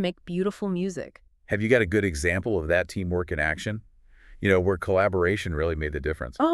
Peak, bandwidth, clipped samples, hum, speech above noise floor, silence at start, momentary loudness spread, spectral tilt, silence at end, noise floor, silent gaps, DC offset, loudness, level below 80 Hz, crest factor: -6 dBFS; 13 kHz; under 0.1%; none; 25 dB; 0 s; 9 LU; -6 dB/octave; 0 s; -50 dBFS; none; under 0.1%; -26 LUFS; -42 dBFS; 20 dB